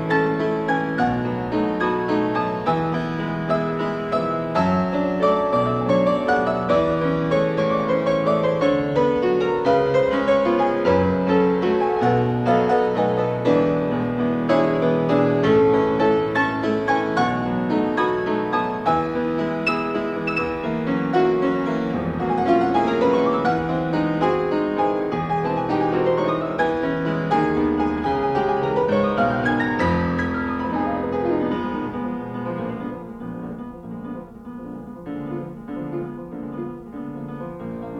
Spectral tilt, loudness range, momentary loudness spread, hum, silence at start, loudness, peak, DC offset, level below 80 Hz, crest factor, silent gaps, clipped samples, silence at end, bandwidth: -8 dB/octave; 10 LU; 13 LU; none; 0 s; -21 LUFS; -6 dBFS; under 0.1%; -48 dBFS; 14 dB; none; under 0.1%; 0 s; 9.2 kHz